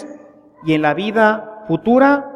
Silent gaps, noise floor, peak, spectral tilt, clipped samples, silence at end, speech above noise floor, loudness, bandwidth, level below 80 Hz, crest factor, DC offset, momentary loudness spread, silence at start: none; -42 dBFS; -2 dBFS; -7.5 dB/octave; under 0.1%; 0 s; 28 dB; -16 LUFS; 9.4 kHz; -56 dBFS; 16 dB; under 0.1%; 13 LU; 0 s